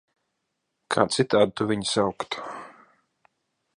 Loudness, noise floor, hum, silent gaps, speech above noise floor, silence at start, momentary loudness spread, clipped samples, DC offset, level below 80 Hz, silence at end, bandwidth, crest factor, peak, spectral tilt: -24 LUFS; -79 dBFS; none; none; 55 dB; 0.9 s; 13 LU; under 0.1%; under 0.1%; -62 dBFS; 1.05 s; 11.5 kHz; 26 dB; -2 dBFS; -4.5 dB/octave